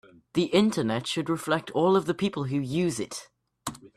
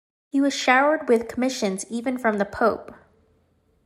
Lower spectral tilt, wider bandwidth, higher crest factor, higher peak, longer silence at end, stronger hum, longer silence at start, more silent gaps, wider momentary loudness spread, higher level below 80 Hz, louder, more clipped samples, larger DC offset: first, -5.5 dB/octave vs -4 dB/octave; about the same, 14.5 kHz vs 15 kHz; about the same, 18 dB vs 18 dB; second, -10 dBFS vs -6 dBFS; second, 0.1 s vs 0.9 s; neither; about the same, 0.35 s vs 0.35 s; neither; first, 14 LU vs 10 LU; about the same, -64 dBFS vs -60 dBFS; second, -27 LUFS vs -22 LUFS; neither; neither